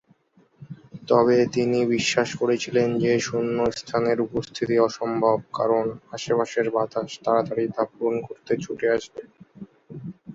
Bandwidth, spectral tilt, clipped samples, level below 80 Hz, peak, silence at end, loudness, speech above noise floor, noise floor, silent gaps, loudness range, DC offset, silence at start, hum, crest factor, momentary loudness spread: 7.8 kHz; -5 dB/octave; under 0.1%; -60 dBFS; -4 dBFS; 0 s; -23 LUFS; 37 dB; -59 dBFS; none; 4 LU; under 0.1%; 0.6 s; none; 20 dB; 17 LU